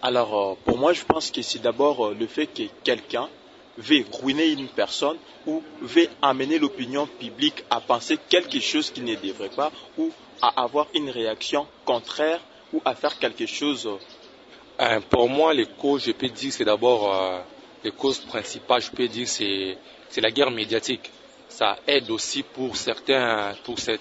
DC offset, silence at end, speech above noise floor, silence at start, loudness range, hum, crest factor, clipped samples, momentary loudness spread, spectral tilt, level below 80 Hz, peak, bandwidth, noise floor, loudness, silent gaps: under 0.1%; 0 s; 24 dB; 0 s; 3 LU; none; 22 dB; under 0.1%; 10 LU; -3 dB/octave; -60 dBFS; -2 dBFS; 8 kHz; -48 dBFS; -24 LUFS; none